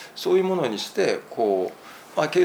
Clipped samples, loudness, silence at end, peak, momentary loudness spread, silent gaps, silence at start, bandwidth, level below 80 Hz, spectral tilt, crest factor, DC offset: under 0.1%; -24 LUFS; 0 s; -8 dBFS; 10 LU; none; 0 s; over 20 kHz; -74 dBFS; -5 dB/octave; 16 dB; under 0.1%